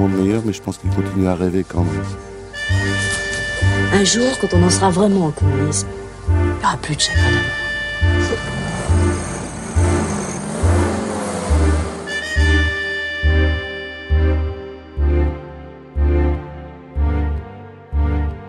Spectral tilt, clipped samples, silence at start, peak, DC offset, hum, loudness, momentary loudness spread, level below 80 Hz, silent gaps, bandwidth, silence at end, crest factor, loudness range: -5 dB/octave; under 0.1%; 0 s; -2 dBFS; under 0.1%; none; -18 LUFS; 12 LU; -24 dBFS; none; 11.5 kHz; 0 s; 16 dB; 5 LU